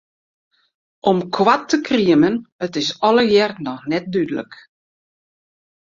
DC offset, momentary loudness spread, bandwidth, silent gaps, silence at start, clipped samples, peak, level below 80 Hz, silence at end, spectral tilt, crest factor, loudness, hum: under 0.1%; 11 LU; 7.6 kHz; 2.52-2.59 s; 1.05 s; under 0.1%; -2 dBFS; -60 dBFS; 1.3 s; -5 dB/octave; 18 dB; -18 LUFS; none